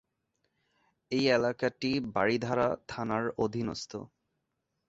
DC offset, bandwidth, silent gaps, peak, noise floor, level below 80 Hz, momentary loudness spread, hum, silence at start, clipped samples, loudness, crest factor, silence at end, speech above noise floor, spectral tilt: under 0.1%; 8 kHz; none; -12 dBFS; -82 dBFS; -64 dBFS; 9 LU; none; 1.1 s; under 0.1%; -31 LUFS; 20 dB; 0.85 s; 52 dB; -5.5 dB/octave